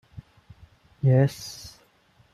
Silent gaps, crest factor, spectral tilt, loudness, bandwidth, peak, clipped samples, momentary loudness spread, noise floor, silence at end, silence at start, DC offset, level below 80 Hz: none; 20 dB; -7 dB/octave; -23 LUFS; 14 kHz; -8 dBFS; under 0.1%; 21 LU; -61 dBFS; 0.65 s; 1.05 s; under 0.1%; -58 dBFS